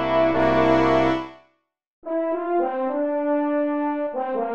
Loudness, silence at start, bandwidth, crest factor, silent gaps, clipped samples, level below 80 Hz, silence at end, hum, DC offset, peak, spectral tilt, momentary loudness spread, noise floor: -22 LUFS; 0 s; 7.4 kHz; 16 dB; 1.87-2.02 s; under 0.1%; -50 dBFS; 0 s; none; under 0.1%; -6 dBFS; -7.5 dB/octave; 9 LU; -67 dBFS